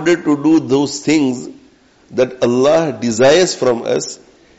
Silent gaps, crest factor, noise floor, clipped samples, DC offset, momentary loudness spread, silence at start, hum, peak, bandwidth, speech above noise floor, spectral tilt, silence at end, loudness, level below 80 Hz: none; 12 dB; -49 dBFS; under 0.1%; under 0.1%; 14 LU; 0 s; none; -4 dBFS; 8.2 kHz; 35 dB; -4.5 dB/octave; 0.45 s; -14 LUFS; -52 dBFS